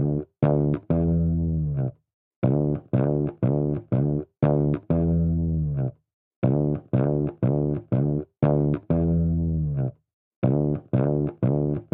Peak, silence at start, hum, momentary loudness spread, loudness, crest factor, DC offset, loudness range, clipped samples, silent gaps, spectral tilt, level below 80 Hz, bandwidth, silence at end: -8 dBFS; 0 s; none; 5 LU; -24 LUFS; 16 dB; under 0.1%; 1 LU; under 0.1%; 2.14-2.42 s, 6.14-6.42 s, 10.13-10.42 s; -14.5 dB/octave; -38 dBFS; 3.6 kHz; 0.1 s